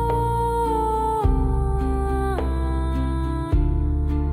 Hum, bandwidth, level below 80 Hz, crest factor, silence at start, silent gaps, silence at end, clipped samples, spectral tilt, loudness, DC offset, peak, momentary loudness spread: none; 14 kHz; -24 dBFS; 14 dB; 0 s; none; 0 s; under 0.1%; -8.5 dB/octave; -23 LUFS; under 0.1%; -6 dBFS; 3 LU